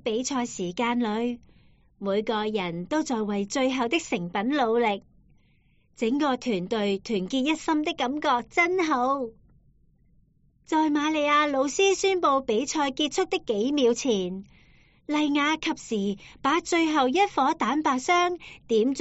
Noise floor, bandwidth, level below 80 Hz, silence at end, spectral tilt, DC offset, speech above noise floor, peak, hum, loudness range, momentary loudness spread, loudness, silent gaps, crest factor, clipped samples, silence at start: -63 dBFS; 8 kHz; -60 dBFS; 0 s; -2.5 dB/octave; under 0.1%; 37 dB; -10 dBFS; none; 4 LU; 7 LU; -25 LUFS; none; 16 dB; under 0.1%; 0.05 s